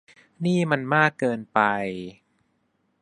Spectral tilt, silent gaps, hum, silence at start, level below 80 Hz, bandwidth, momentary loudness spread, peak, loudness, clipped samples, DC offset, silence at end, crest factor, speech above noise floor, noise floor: -6.5 dB/octave; none; none; 0.4 s; -66 dBFS; 10.5 kHz; 12 LU; -2 dBFS; -23 LUFS; under 0.1%; under 0.1%; 0.9 s; 22 dB; 47 dB; -70 dBFS